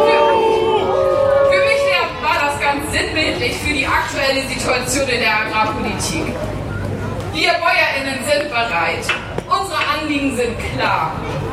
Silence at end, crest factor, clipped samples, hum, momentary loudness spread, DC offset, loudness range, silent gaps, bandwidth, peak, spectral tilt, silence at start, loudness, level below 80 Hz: 0 s; 16 dB; under 0.1%; none; 8 LU; under 0.1%; 3 LU; none; 15.5 kHz; -2 dBFS; -4 dB/octave; 0 s; -17 LUFS; -36 dBFS